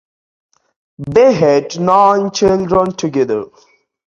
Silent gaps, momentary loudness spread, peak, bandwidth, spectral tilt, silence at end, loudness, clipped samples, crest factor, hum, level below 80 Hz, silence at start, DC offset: none; 9 LU; 0 dBFS; 7.6 kHz; -6 dB/octave; 0.6 s; -13 LUFS; under 0.1%; 14 dB; none; -46 dBFS; 1 s; under 0.1%